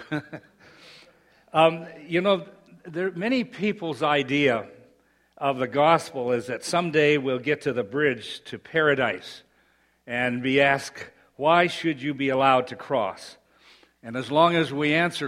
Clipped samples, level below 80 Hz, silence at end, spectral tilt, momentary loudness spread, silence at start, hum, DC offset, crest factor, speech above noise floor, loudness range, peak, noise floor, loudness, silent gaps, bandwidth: under 0.1%; -66 dBFS; 0 s; -5 dB/octave; 16 LU; 0 s; none; under 0.1%; 22 dB; 40 dB; 3 LU; -4 dBFS; -64 dBFS; -24 LUFS; none; 15 kHz